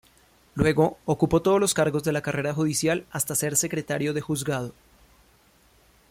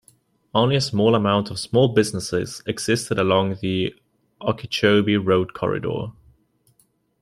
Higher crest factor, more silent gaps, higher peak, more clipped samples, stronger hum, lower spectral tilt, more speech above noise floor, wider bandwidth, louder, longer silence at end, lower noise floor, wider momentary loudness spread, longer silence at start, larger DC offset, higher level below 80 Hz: about the same, 18 dB vs 18 dB; neither; second, -8 dBFS vs -4 dBFS; neither; neither; about the same, -4.5 dB/octave vs -5.5 dB/octave; second, 35 dB vs 43 dB; about the same, 16.5 kHz vs 15.5 kHz; second, -24 LUFS vs -21 LUFS; first, 1.4 s vs 1.1 s; second, -59 dBFS vs -64 dBFS; second, 7 LU vs 10 LU; about the same, 0.55 s vs 0.55 s; neither; about the same, -52 dBFS vs -56 dBFS